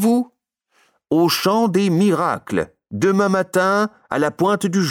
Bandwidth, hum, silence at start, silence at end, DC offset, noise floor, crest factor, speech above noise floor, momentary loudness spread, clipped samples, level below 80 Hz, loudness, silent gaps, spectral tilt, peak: 17.5 kHz; none; 0 s; 0 s; under 0.1%; -65 dBFS; 12 dB; 48 dB; 6 LU; under 0.1%; -58 dBFS; -18 LUFS; none; -5.5 dB/octave; -6 dBFS